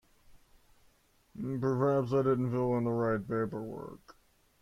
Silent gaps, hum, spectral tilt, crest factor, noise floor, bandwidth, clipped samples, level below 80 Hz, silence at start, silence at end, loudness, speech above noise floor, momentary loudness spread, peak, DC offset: none; none; -9.5 dB/octave; 18 dB; -67 dBFS; 14 kHz; under 0.1%; -64 dBFS; 0.3 s; 0.5 s; -32 LUFS; 36 dB; 14 LU; -16 dBFS; under 0.1%